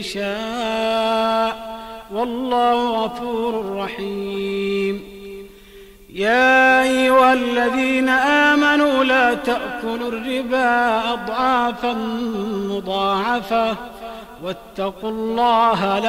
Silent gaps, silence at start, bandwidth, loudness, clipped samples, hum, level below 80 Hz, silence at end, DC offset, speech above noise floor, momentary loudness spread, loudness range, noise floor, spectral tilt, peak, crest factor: none; 0 s; 16 kHz; -18 LUFS; under 0.1%; none; -50 dBFS; 0 s; under 0.1%; 24 dB; 16 LU; 8 LU; -43 dBFS; -4.5 dB/octave; -4 dBFS; 14 dB